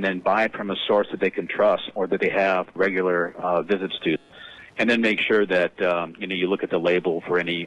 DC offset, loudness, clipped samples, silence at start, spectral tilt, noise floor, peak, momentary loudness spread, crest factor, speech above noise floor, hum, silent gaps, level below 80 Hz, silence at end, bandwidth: under 0.1%; -23 LUFS; under 0.1%; 0 s; -6 dB/octave; -44 dBFS; -8 dBFS; 7 LU; 14 dB; 22 dB; none; none; -64 dBFS; 0 s; 10 kHz